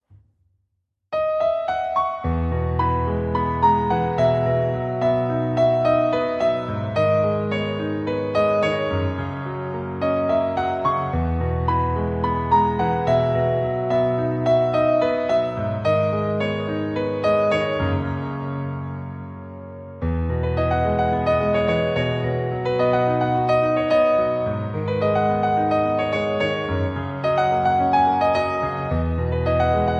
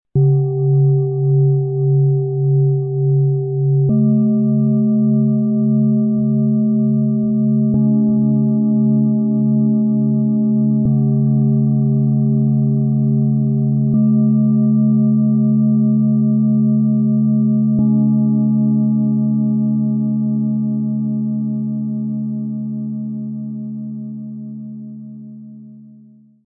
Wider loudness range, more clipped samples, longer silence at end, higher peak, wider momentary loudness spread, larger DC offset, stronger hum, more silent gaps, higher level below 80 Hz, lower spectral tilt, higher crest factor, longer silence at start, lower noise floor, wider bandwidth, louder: second, 4 LU vs 8 LU; neither; second, 0 s vs 0.6 s; about the same, -6 dBFS vs -6 dBFS; second, 7 LU vs 10 LU; neither; neither; neither; first, -36 dBFS vs -54 dBFS; second, -8 dB/octave vs -19 dB/octave; about the same, 14 dB vs 10 dB; first, 1.1 s vs 0.15 s; first, -74 dBFS vs -45 dBFS; first, 7.8 kHz vs 1.3 kHz; second, -21 LUFS vs -16 LUFS